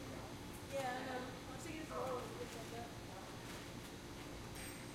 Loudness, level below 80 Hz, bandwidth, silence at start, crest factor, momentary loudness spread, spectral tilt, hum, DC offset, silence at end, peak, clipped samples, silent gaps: -48 LUFS; -62 dBFS; 16.5 kHz; 0 s; 16 dB; 7 LU; -4.5 dB/octave; none; under 0.1%; 0 s; -32 dBFS; under 0.1%; none